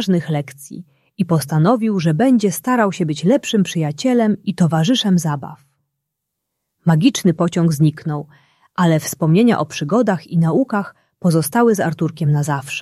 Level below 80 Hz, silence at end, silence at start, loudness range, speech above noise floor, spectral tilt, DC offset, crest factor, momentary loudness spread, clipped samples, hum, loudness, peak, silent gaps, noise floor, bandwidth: -60 dBFS; 0 s; 0 s; 3 LU; 62 dB; -6 dB/octave; under 0.1%; 14 dB; 10 LU; under 0.1%; none; -17 LUFS; -2 dBFS; none; -78 dBFS; 14.5 kHz